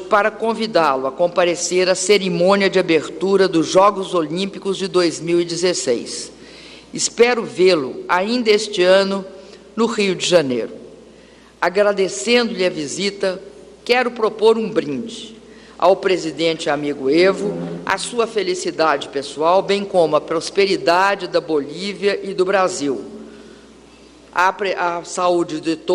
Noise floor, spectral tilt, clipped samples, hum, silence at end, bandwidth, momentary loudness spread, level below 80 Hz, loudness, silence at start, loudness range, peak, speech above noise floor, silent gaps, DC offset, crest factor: -45 dBFS; -4 dB/octave; under 0.1%; none; 0 s; 11.5 kHz; 10 LU; -58 dBFS; -18 LUFS; 0 s; 4 LU; -2 dBFS; 28 dB; none; under 0.1%; 16 dB